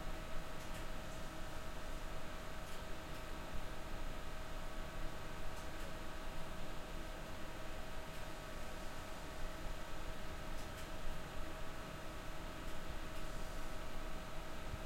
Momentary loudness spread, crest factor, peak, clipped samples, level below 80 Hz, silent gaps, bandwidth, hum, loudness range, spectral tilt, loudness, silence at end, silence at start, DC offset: 1 LU; 14 dB; -28 dBFS; under 0.1%; -48 dBFS; none; 16.5 kHz; none; 0 LU; -4.5 dB/octave; -49 LUFS; 0 s; 0 s; under 0.1%